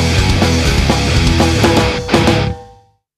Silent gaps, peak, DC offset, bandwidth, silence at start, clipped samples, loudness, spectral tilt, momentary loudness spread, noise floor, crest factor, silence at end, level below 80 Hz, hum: none; 0 dBFS; under 0.1%; 14 kHz; 0 s; under 0.1%; -13 LUFS; -5 dB/octave; 4 LU; -45 dBFS; 12 dB; 0.5 s; -20 dBFS; none